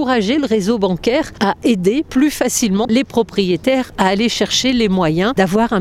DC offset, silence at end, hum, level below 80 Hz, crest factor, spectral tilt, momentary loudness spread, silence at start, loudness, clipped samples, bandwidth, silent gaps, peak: under 0.1%; 0 s; none; -42 dBFS; 16 dB; -4.5 dB/octave; 2 LU; 0 s; -16 LUFS; under 0.1%; 16 kHz; none; 0 dBFS